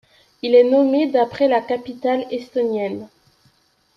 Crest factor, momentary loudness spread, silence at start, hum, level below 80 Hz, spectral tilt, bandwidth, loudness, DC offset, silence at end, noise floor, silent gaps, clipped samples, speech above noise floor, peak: 16 dB; 12 LU; 0.45 s; none; -66 dBFS; -6.5 dB/octave; 6.2 kHz; -19 LUFS; under 0.1%; 0.9 s; -60 dBFS; none; under 0.1%; 42 dB; -4 dBFS